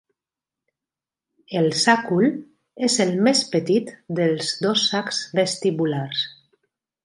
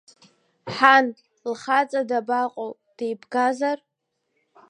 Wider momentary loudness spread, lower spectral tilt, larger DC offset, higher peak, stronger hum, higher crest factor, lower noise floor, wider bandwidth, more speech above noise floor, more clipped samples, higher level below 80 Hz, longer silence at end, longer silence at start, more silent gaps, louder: second, 8 LU vs 18 LU; about the same, -4 dB/octave vs -4 dB/octave; neither; about the same, -2 dBFS vs 0 dBFS; neither; about the same, 20 dB vs 24 dB; first, -89 dBFS vs -75 dBFS; first, 11.5 kHz vs 10 kHz; first, 68 dB vs 53 dB; neither; first, -70 dBFS vs -76 dBFS; second, 0.75 s vs 0.95 s; first, 1.5 s vs 0.65 s; neither; about the same, -21 LUFS vs -22 LUFS